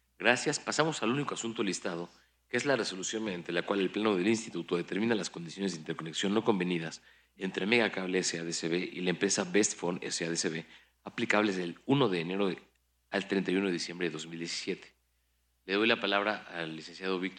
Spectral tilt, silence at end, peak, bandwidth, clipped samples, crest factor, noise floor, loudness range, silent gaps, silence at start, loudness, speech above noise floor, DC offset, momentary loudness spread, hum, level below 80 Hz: -3.5 dB/octave; 0 s; -8 dBFS; 11 kHz; under 0.1%; 24 dB; -74 dBFS; 3 LU; none; 0.2 s; -32 LUFS; 42 dB; under 0.1%; 11 LU; none; -76 dBFS